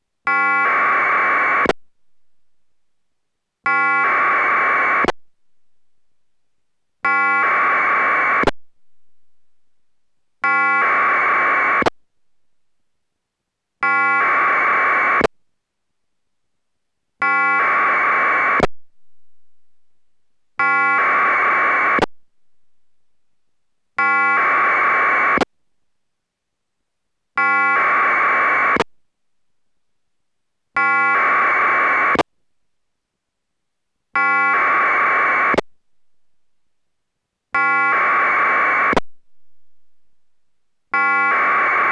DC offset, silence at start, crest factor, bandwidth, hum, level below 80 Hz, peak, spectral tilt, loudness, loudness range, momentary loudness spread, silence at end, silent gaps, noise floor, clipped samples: under 0.1%; 0.25 s; 16 dB; 10 kHz; none; -52 dBFS; -4 dBFS; -4.5 dB/octave; -16 LUFS; 2 LU; 7 LU; 0 s; none; -79 dBFS; under 0.1%